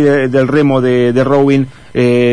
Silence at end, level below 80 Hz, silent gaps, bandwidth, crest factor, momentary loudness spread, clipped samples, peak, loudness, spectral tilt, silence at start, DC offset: 0 s; -44 dBFS; none; 10.5 kHz; 10 dB; 4 LU; under 0.1%; 0 dBFS; -11 LUFS; -8 dB/octave; 0 s; 2%